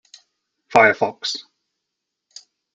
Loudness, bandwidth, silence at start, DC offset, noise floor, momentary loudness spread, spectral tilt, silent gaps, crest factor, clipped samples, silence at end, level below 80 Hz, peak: -18 LUFS; 9.2 kHz; 0.7 s; under 0.1%; -81 dBFS; 13 LU; -3 dB/octave; none; 22 dB; under 0.1%; 1.35 s; -62 dBFS; 0 dBFS